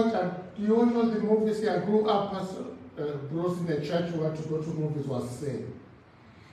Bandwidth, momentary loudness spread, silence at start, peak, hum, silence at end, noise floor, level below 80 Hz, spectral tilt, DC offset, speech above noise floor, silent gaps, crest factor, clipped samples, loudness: 12.5 kHz; 12 LU; 0 s; -12 dBFS; none; 0.15 s; -53 dBFS; -64 dBFS; -7.5 dB/octave; under 0.1%; 25 dB; none; 18 dB; under 0.1%; -29 LUFS